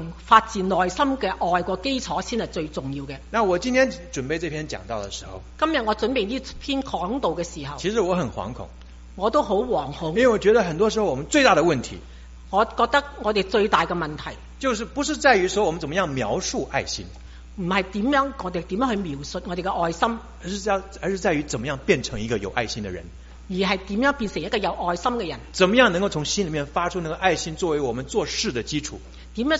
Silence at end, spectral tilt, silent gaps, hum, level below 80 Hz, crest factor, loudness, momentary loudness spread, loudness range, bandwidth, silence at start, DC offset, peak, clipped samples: 0 s; -3.5 dB/octave; none; none; -42 dBFS; 24 dB; -23 LUFS; 13 LU; 5 LU; 8 kHz; 0 s; under 0.1%; 0 dBFS; under 0.1%